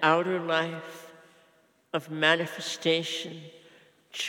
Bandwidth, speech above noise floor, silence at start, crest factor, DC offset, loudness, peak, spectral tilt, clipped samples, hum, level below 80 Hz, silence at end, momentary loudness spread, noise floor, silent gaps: 18 kHz; 36 dB; 0 s; 22 dB; under 0.1%; -27 LUFS; -8 dBFS; -3.5 dB/octave; under 0.1%; none; under -90 dBFS; 0 s; 20 LU; -64 dBFS; none